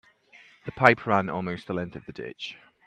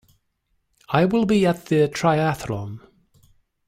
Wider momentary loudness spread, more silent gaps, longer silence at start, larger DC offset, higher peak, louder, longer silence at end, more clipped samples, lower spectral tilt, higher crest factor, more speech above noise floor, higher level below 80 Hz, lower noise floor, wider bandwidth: first, 19 LU vs 12 LU; neither; second, 0.65 s vs 0.9 s; neither; first, 0 dBFS vs -6 dBFS; second, -25 LUFS vs -21 LUFS; second, 0.3 s vs 0.9 s; neither; about the same, -6.5 dB/octave vs -6.5 dB/octave; first, 28 dB vs 18 dB; second, 29 dB vs 51 dB; second, -62 dBFS vs -54 dBFS; second, -55 dBFS vs -71 dBFS; second, 11 kHz vs 16 kHz